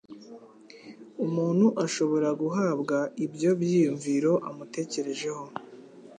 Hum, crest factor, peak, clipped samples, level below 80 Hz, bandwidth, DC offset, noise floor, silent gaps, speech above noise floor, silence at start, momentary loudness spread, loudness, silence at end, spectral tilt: none; 16 dB; -10 dBFS; under 0.1%; -78 dBFS; 10 kHz; under 0.1%; -50 dBFS; none; 24 dB; 0.1 s; 18 LU; -27 LUFS; 0 s; -6 dB/octave